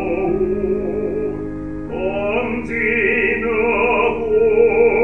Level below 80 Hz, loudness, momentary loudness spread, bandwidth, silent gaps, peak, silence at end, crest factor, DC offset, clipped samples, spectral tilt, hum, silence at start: -38 dBFS; -18 LUFS; 10 LU; 3.4 kHz; none; -4 dBFS; 0 s; 14 dB; 1%; under 0.1%; -8 dB/octave; none; 0 s